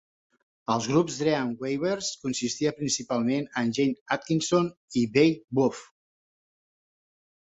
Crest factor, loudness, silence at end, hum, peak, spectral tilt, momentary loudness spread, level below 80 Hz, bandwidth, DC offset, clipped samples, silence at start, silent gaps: 20 dB; -27 LUFS; 1.7 s; none; -8 dBFS; -4.5 dB/octave; 7 LU; -66 dBFS; 8.4 kHz; under 0.1%; under 0.1%; 0.7 s; 4.01-4.06 s, 4.77-4.88 s, 5.44-5.48 s